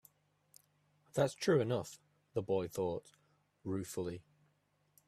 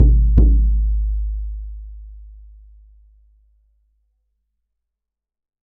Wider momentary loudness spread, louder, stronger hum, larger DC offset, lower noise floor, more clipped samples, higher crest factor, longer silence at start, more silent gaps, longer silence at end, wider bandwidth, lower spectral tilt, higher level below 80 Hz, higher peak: second, 17 LU vs 24 LU; second, -37 LUFS vs -19 LUFS; first, 50 Hz at -65 dBFS vs none; neither; second, -77 dBFS vs -83 dBFS; neither; about the same, 22 dB vs 18 dB; first, 1.15 s vs 0 s; neither; second, 0.9 s vs 3.4 s; first, 15 kHz vs 1 kHz; second, -6 dB/octave vs -14.5 dB/octave; second, -74 dBFS vs -20 dBFS; second, -18 dBFS vs 0 dBFS